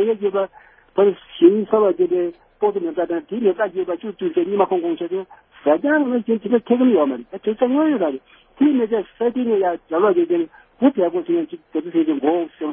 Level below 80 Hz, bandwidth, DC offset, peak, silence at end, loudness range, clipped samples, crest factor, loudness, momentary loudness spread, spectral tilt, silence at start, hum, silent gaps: -64 dBFS; 3.6 kHz; under 0.1%; -2 dBFS; 0 s; 2 LU; under 0.1%; 18 dB; -19 LUFS; 9 LU; -11 dB/octave; 0 s; none; none